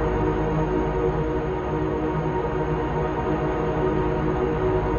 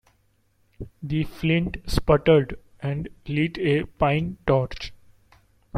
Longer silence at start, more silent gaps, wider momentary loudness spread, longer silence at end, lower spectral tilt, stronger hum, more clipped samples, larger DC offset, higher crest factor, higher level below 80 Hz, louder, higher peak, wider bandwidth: second, 0 s vs 0.8 s; neither; second, 2 LU vs 16 LU; about the same, 0 s vs 0 s; first, -8.5 dB/octave vs -7 dB/octave; neither; neither; neither; second, 12 dB vs 20 dB; first, -32 dBFS vs -40 dBFS; about the same, -24 LUFS vs -24 LUFS; second, -10 dBFS vs -4 dBFS; second, 7 kHz vs 14 kHz